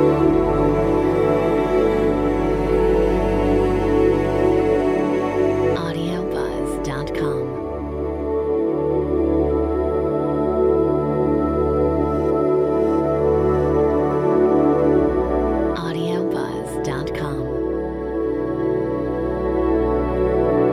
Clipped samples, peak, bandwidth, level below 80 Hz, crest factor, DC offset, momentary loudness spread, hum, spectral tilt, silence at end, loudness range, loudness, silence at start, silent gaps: under 0.1%; -4 dBFS; 12.5 kHz; -32 dBFS; 14 dB; under 0.1%; 7 LU; none; -8 dB/octave; 0 s; 5 LU; -20 LUFS; 0 s; none